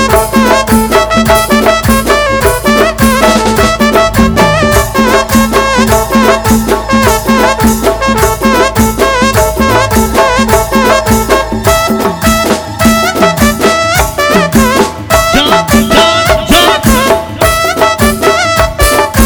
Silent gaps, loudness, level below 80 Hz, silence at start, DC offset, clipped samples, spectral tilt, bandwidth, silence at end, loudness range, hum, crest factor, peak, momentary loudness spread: none; -8 LUFS; -20 dBFS; 0 s; under 0.1%; 4%; -4 dB/octave; over 20 kHz; 0 s; 1 LU; none; 8 dB; 0 dBFS; 3 LU